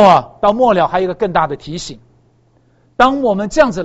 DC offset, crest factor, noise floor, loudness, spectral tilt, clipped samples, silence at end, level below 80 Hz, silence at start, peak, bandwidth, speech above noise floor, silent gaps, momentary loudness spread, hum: under 0.1%; 14 dB; -53 dBFS; -14 LUFS; -5.5 dB/octave; 0.2%; 0 s; -40 dBFS; 0 s; 0 dBFS; 8.2 kHz; 41 dB; none; 14 LU; none